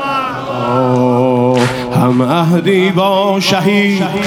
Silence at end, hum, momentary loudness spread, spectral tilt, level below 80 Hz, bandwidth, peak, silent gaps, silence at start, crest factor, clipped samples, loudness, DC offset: 0 s; none; 5 LU; -6 dB/octave; -48 dBFS; 16.5 kHz; 0 dBFS; none; 0 s; 12 dB; under 0.1%; -12 LUFS; under 0.1%